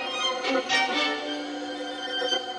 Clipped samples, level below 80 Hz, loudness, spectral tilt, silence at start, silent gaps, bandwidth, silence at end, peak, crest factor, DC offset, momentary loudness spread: under 0.1%; -84 dBFS; -26 LUFS; -1 dB/octave; 0 s; none; 10 kHz; 0 s; -12 dBFS; 16 dB; under 0.1%; 10 LU